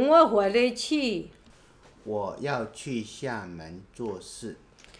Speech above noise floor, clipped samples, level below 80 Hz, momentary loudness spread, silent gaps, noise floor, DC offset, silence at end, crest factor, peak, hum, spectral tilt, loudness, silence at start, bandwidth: 29 dB; under 0.1%; -60 dBFS; 21 LU; none; -55 dBFS; under 0.1%; 0.45 s; 20 dB; -6 dBFS; none; -4.5 dB/octave; -27 LUFS; 0 s; 10.5 kHz